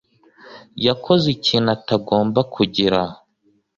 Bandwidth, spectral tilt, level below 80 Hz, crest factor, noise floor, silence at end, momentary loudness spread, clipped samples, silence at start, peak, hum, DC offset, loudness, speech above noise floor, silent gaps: 7.6 kHz; -6.5 dB/octave; -52 dBFS; 20 dB; -62 dBFS; 0.6 s; 5 LU; under 0.1%; 0.45 s; 0 dBFS; none; under 0.1%; -19 LUFS; 44 dB; none